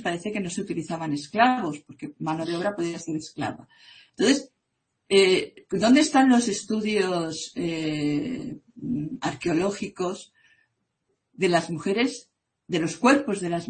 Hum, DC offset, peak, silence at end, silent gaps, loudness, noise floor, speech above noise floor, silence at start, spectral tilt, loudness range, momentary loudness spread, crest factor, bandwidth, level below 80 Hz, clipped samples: none; under 0.1%; -4 dBFS; 0 s; none; -25 LUFS; -78 dBFS; 53 dB; 0 s; -4.5 dB/octave; 7 LU; 14 LU; 22 dB; 8.8 kHz; -64 dBFS; under 0.1%